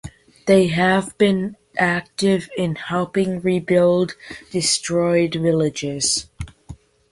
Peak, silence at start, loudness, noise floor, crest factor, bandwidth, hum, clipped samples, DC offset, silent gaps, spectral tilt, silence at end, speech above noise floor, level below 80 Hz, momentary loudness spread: -2 dBFS; 0.05 s; -19 LUFS; -42 dBFS; 18 dB; 11.5 kHz; none; under 0.1%; under 0.1%; none; -4.5 dB/octave; 0.35 s; 23 dB; -48 dBFS; 10 LU